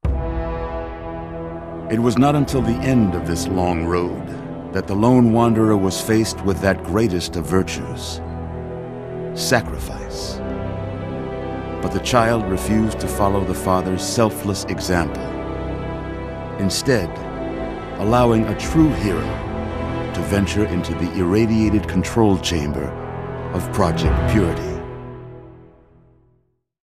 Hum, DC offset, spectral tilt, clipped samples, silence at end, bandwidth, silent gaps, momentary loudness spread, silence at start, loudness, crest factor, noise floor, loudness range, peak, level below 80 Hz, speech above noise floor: none; under 0.1%; -6 dB/octave; under 0.1%; 1.2 s; 15 kHz; none; 13 LU; 0.05 s; -20 LUFS; 20 dB; -63 dBFS; 5 LU; 0 dBFS; -32 dBFS; 45 dB